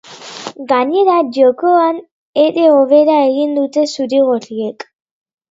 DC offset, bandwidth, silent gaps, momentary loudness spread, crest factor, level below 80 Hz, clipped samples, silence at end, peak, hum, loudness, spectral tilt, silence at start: under 0.1%; 7.8 kHz; 2.11-2.33 s; 17 LU; 14 dB; -68 dBFS; under 0.1%; 0.8 s; 0 dBFS; none; -13 LUFS; -4.5 dB/octave; 0.1 s